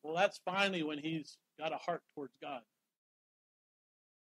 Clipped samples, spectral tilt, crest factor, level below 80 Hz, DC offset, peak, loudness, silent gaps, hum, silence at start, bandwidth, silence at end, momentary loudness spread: under 0.1%; -4.5 dB/octave; 24 dB; under -90 dBFS; under 0.1%; -18 dBFS; -38 LUFS; none; none; 0.05 s; 13.5 kHz; 1.75 s; 15 LU